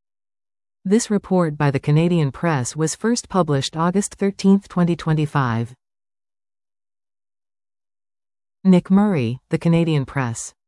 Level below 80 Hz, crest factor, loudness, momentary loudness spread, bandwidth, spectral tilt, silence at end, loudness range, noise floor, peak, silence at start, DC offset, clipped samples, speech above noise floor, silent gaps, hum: -52 dBFS; 16 dB; -19 LUFS; 6 LU; 12 kHz; -6.5 dB/octave; 0.2 s; 7 LU; under -90 dBFS; -4 dBFS; 0.85 s; under 0.1%; under 0.1%; over 71 dB; none; none